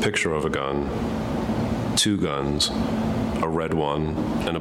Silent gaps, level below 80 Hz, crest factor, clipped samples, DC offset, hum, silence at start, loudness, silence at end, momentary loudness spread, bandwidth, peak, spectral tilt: none; -40 dBFS; 16 dB; under 0.1%; under 0.1%; none; 0 s; -24 LUFS; 0 s; 5 LU; 16 kHz; -8 dBFS; -4.5 dB/octave